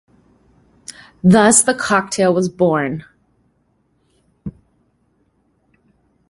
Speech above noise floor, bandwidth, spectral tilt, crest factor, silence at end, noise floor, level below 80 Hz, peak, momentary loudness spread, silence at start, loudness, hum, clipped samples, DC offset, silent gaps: 48 dB; 11.5 kHz; -4.5 dB/octave; 20 dB; 1.8 s; -62 dBFS; -52 dBFS; 0 dBFS; 26 LU; 0.9 s; -14 LUFS; none; under 0.1%; under 0.1%; none